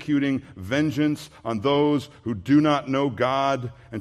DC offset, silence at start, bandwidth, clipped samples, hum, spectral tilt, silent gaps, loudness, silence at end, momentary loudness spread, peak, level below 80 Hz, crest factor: under 0.1%; 0 s; 13 kHz; under 0.1%; none; -6.5 dB/octave; none; -23 LUFS; 0 s; 11 LU; -8 dBFS; -60 dBFS; 14 dB